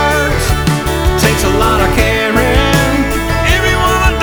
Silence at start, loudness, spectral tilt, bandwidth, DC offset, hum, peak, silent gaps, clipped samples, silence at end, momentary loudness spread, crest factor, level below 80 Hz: 0 s; -12 LUFS; -4.5 dB/octave; over 20 kHz; under 0.1%; none; 0 dBFS; none; under 0.1%; 0 s; 3 LU; 12 dB; -18 dBFS